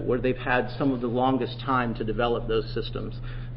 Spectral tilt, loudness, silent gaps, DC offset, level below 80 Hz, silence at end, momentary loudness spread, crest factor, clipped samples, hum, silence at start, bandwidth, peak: -11 dB/octave; -27 LUFS; none; under 0.1%; -38 dBFS; 0 s; 9 LU; 18 dB; under 0.1%; none; 0 s; 5.8 kHz; -8 dBFS